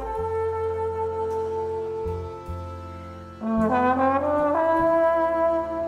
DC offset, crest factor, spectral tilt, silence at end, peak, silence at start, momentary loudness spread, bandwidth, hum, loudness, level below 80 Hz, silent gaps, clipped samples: under 0.1%; 14 dB; -8 dB/octave; 0 s; -10 dBFS; 0 s; 15 LU; 11 kHz; none; -24 LUFS; -46 dBFS; none; under 0.1%